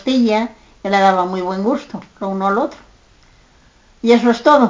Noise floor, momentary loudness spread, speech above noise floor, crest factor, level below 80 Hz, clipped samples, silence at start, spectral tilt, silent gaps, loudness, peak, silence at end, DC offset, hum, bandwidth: -50 dBFS; 14 LU; 35 dB; 16 dB; -54 dBFS; under 0.1%; 0.05 s; -6 dB/octave; none; -16 LUFS; 0 dBFS; 0 s; under 0.1%; none; 7.6 kHz